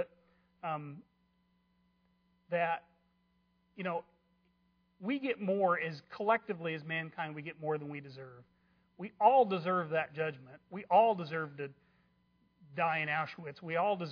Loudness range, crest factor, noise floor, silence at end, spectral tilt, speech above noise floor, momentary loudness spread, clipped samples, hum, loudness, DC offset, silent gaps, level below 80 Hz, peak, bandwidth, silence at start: 10 LU; 22 dB; -74 dBFS; 0 s; -4 dB/octave; 41 dB; 20 LU; under 0.1%; none; -34 LUFS; under 0.1%; none; -82 dBFS; -12 dBFS; 5.4 kHz; 0 s